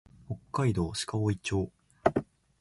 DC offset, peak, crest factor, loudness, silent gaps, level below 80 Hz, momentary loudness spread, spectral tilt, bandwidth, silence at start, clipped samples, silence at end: under 0.1%; -8 dBFS; 24 dB; -31 LUFS; none; -50 dBFS; 10 LU; -6 dB/octave; 11.5 kHz; 0.3 s; under 0.1%; 0.4 s